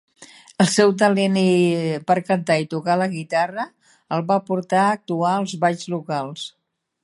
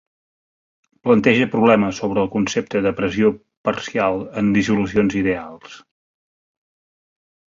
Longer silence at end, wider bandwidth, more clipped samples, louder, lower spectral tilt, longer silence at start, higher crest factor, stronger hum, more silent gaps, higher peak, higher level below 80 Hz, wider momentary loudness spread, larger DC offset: second, 0.55 s vs 1.8 s; first, 11.5 kHz vs 7.6 kHz; neither; about the same, -20 LUFS vs -19 LUFS; about the same, -5.5 dB/octave vs -6 dB/octave; second, 0.2 s vs 1.05 s; about the same, 18 dB vs 18 dB; neither; second, none vs 3.57-3.64 s; about the same, -2 dBFS vs -2 dBFS; second, -68 dBFS vs -50 dBFS; about the same, 11 LU vs 10 LU; neither